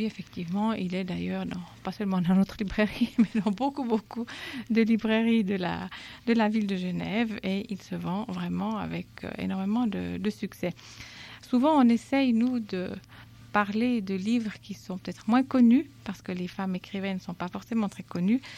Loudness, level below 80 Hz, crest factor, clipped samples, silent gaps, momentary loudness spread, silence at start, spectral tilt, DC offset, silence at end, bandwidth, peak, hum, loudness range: -28 LUFS; -58 dBFS; 18 dB; under 0.1%; none; 13 LU; 0 s; -7 dB/octave; under 0.1%; 0 s; 13 kHz; -10 dBFS; none; 5 LU